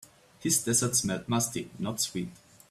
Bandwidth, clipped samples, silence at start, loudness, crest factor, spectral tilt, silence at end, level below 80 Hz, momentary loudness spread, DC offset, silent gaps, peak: 16 kHz; under 0.1%; 0.4 s; -28 LUFS; 20 dB; -3 dB/octave; 0.35 s; -64 dBFS; 11 LU; under 0.1%; none; -12 dBFS